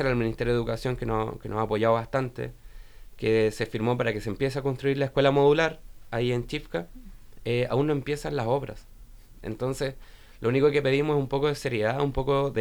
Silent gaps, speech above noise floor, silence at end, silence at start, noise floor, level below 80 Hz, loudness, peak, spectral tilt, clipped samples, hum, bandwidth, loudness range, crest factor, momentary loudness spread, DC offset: none; 21 dB; 0 s; 0 s; -47 dBFS; -44 dBFS; -27 LUFS; -8 dBFS; -6.5 dB/octave; under 0.1%; none; 20 kHz; 5 LU; 20 dB; 11 LU; under 0.1%